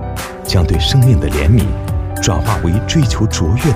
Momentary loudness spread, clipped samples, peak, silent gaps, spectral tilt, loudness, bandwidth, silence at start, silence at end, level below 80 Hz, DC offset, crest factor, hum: 8 LU; under 0.1%; 0 dBFS; none; -5.5 dB/octave; -14 LUFS; 16 kHz; 0 s; 0 s; -20 dBFS; under 0.1%; 12 dB; none